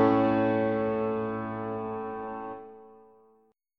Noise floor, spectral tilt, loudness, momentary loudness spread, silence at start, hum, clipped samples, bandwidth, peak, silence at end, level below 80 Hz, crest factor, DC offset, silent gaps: -66 dBFS; -9.5 dB/octave; -29 LUFS; 15 LU; 0 s; none; under 0.1%; 5.8 kHz; -12 dBFS; 0.85 s; -62 dBFS; 18 dB; under 0.1%; none